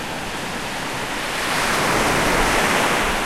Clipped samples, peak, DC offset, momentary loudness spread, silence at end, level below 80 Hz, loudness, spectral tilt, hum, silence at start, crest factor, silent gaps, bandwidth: under 0.1%; -6 dBFS; 0.9%; 9 LU; 0 s; -34 dBFS; -20 LUFS; -2.5 dB/octave; none; 0 s; 14 dB; none; 16 kHz